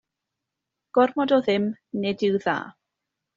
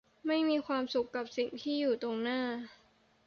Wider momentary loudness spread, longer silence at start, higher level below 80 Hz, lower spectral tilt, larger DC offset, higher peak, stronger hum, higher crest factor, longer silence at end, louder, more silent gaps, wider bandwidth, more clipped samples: about the same, 8 LU vs 7 LU; first, 0.95 s vs 0.25 s; first, -68 dBFS vs -76 dBFS; about the same, -4 dB/octave vs -4.5 dB/octave; neither; first, -6 dBFS vs -20 dBFS; neither; first, 20 dB vs 14 dB; about the same, 0.65 s vs 0.55 s; first, -24 LUFS vs -34 LUFS; neither; about the same, 7.4 kHz vs 7 kHz; neither